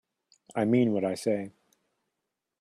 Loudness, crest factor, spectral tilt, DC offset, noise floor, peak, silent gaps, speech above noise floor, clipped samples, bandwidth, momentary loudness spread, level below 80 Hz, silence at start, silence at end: -28 LUFS; 18 dB; -7 dB/octave; under 0.1%; -85 dBFS; -12 dBFS; none; 58 dB; under 0.1%; 13.5 kHz; 12 LU; -72 dBFS; 0.55 s; 1.1 s